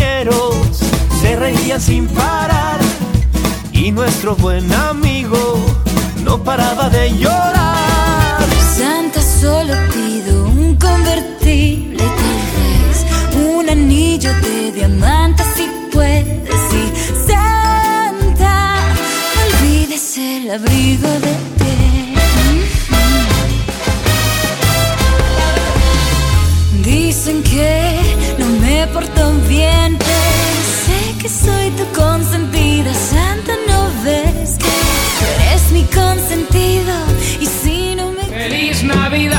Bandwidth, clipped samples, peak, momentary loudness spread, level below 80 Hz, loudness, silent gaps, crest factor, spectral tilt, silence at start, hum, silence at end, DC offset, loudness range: 19 kHz; under 0.1%; 0 dBFS; 4 LU; -18 dBFS; -13 LUFS; none; 12 dB; -4.5 dB/octave; 0 s; none; 0 s; under 0.1%; 2 LU